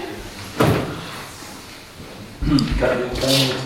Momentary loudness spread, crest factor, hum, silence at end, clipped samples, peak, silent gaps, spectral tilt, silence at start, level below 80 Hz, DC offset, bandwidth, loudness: 19 LU; 20 dB; none; 0 s; under 0.1%; -2 dBFS; none; -5 dB/octave; 0 s; -34 dBFS; under 0.1%; 16.5 kHz; -20 LUFS